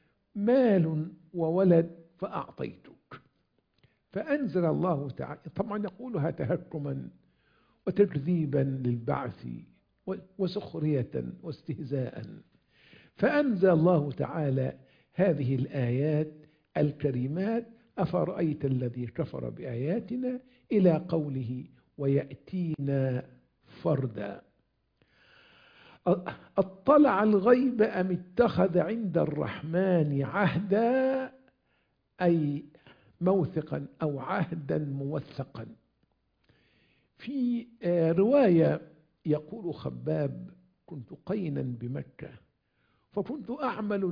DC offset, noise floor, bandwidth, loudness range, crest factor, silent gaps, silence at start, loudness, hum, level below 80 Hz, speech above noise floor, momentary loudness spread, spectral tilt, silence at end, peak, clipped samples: under 0.1%; -74 dBFS; 5.2 kHz; 9 LU; 22 dB; none; 0.35 s; -29 LUFS; none; -64 dBFS; 46 dB; 16 LU; -11 dB/octave; 0 s; -8 dBFS; under 0.1%